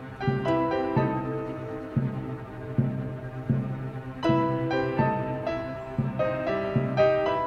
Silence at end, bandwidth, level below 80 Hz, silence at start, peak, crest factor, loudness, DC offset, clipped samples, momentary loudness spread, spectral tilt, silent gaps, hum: 0 s; 6.6 kHz; -50 dBFS; 0 s; -10 dBFS; 16 dB; -28 LUFS; under 0.1%; under 0.1%; 11 LU; -8.5 dB/octave; none; none